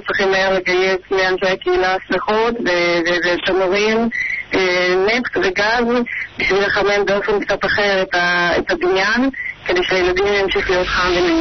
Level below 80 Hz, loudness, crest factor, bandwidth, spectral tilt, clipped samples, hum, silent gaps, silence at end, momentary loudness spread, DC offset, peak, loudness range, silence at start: -40 dBFS; -16 LUFS; 10 dB; 6.4 kHz; -4 dB/octave; under 0.1%; none; none; 0 s; 3 LU; 0.2%; -8 dBFS; 0 LU; 0 s